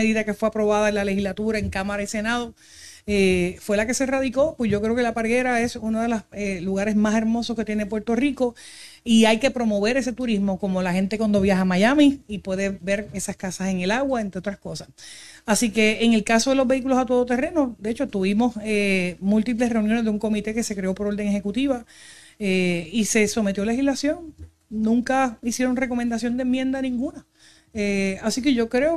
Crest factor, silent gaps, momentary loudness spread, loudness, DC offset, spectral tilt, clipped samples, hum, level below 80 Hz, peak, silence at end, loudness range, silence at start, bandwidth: 18 dB; none; 10 LU; -22 LUFS; 0.3%; -5 dB/octave; under 0.1%; none; -48 dBFS; -4 dBFS; 0 s; 3 LU; 0 s; 13.5 kHz